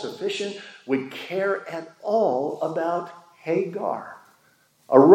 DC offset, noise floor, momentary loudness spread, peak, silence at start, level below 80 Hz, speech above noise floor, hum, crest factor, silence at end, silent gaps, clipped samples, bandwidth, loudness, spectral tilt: under 0.1%; -61 dBFS; 13 LU; -2 dBFS; 0 s; -84 dBFS; 39 dB; none; 22 dB; 0 s; none; under 0.1%; 12.5 kHz; -25 LUFS; -6.5 dB/octave